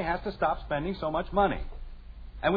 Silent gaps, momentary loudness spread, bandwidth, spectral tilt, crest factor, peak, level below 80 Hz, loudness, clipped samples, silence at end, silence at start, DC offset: none; 21 LU; 5 kHz; -9 dB/octave; 18 dB; -12 dBFS; -40 dBFS; -30 LUFS; under 0.1%; 0 s; 0 s; under 0.1%